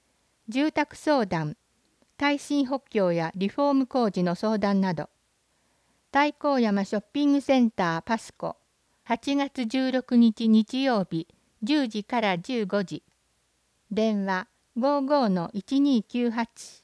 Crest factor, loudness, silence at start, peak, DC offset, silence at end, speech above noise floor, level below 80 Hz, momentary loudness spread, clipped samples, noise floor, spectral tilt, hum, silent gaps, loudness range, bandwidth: 16 dB; -26 LUFS; 0.5 s; -10 dBFS; under 0.1%; 0.1 s; 45 dB; -66 dBFS; 10 LU; under 0.1%; -70 dBFS; -6 dB/octave; none; none; 3 LU; 11 kHz